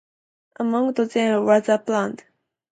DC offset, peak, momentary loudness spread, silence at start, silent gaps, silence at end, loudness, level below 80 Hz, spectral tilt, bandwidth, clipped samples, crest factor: under 0.1%; -4 dBFS; 10 LU; 0.6 s; none; 0.55 s; -21 LUFS; -72 dBFS; -5.5 dB/octave; 9.2 kHz; under 0.1%; 18 dB